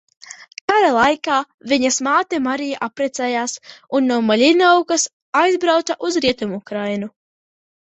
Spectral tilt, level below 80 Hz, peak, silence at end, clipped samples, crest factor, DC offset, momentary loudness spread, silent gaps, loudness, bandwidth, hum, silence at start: -3 dB/octave; -60 dBFS; -2 dBFS; 0.75 s; under 0.1%; 16 dB; under 0.1%; 11 LU; 0.61-0.68 s, 1.54-1.58 s, 5.13-5.33 s; -18 LUFS; 8.2 kHz; none; 0.25 s